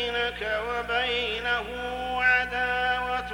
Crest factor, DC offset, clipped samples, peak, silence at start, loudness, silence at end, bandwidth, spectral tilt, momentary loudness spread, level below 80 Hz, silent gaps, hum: 16 dB; under 0.1%; under 0.1%; -10 dBFS; 0 s; -26 LUFS; 0 s; 17 kHz; -3.5 dB/octave; 7 LU; -46 dBFS; none; 60 Hz at -45 dBFS